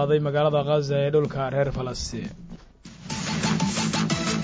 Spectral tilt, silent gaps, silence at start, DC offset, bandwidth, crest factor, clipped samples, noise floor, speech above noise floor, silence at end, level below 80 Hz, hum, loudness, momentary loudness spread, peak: -5 dB/octave; none; 0 s; under 0.1%; 8 kHz; 14 dB; under 0.1%; -46 dBFS; 22 dB; 0 s; -46 dBFS; none; -25 LUFS; 16 LU; -10 dBFS